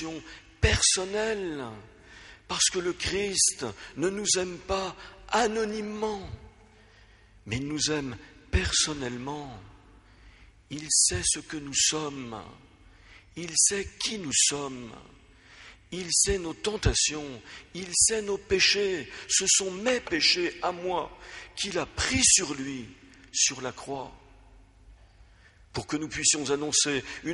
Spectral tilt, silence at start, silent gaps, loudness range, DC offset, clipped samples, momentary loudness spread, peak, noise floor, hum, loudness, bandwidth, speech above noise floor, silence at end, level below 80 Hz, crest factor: -2 dB/octave; 0 s; none; 7 LU; under 0.1%; under 0.1%; 18 LU; -6 dBFS; -56 dBFS; none; -26 LUFS; 11.5 kHz; 28 dB; 0 s; -44 dBFS; 24 dB